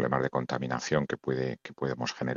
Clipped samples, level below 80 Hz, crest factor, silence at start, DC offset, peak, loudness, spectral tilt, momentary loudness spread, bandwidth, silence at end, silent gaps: under 0.1%; -60 dBFS; 18 dB; 0 s; under 0.1%; -12 dBFS; -31 LUFS; -5.5 dB/octave; 6 LU; 7.6 kHz; 0 s; none